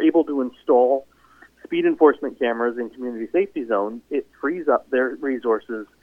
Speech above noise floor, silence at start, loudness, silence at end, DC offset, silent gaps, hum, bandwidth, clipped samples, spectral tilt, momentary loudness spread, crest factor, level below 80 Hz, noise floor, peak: 31 dB; 0 s; -22 LUFS; 0.2 s; under 0.1%; none; none; 3.8 kHz; under 0.1%; -7.5 dB/octave; 11 LU; 18 dB; -64 dBFS; -52 dBFS; -2 dBFS